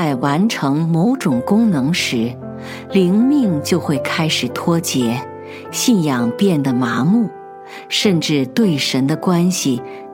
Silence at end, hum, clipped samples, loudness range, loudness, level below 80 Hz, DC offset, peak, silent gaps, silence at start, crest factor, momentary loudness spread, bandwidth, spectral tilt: 0 s; none; under 0.1%; 1 LU; -16 LUFS; -60 dBFS; under 0.1%; -2 dBFS; none; 0 s; 16 dB; 10 LU; 17 kHz; -5 dB/octave